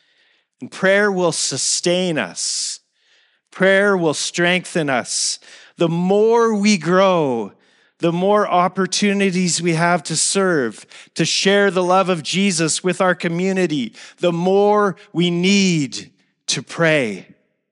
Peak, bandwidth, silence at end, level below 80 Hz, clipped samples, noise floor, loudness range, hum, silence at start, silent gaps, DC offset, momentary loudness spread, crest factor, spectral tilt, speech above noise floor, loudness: -2 dBFS; 11.5 kHz; 0.5 s; -80 dBFS; under 0.1%; -60 dBFS; 2 LU; none; 0.6 s; none; under 0.1%; 8 LU; 16 dB; -4 dB/octave; 43 dB; -17 LUFS